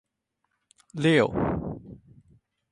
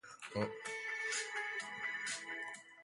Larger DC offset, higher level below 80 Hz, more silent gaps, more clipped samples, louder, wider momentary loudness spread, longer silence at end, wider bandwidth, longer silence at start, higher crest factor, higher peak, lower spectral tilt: neither; first, -50 dBFS vs -76 dBFS; neither; neither; first, -25 LUFS vs -41 LUFS; first, 20 LU vs 6 LU; first, 0.75 s vs 0 s; about the same, 10.5 kHz vs 11.5 kHz; first, 0.95 s vs 0.05 s; about the same, 22 dB vs 20 dB; first, -8 dBFS vs -24 dBFS; first, -6.5 dB/octave vs -2.5 dB/octave